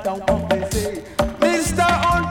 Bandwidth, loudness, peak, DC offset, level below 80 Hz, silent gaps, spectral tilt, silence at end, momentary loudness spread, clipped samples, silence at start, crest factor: 19 kHz; -20 LUFS; -6 dBFS; under 0.1%; -32 dBFS; none; -4.5 dB/octave; 0 s; 7 LU; under 0.1%; 0 s; 14 dB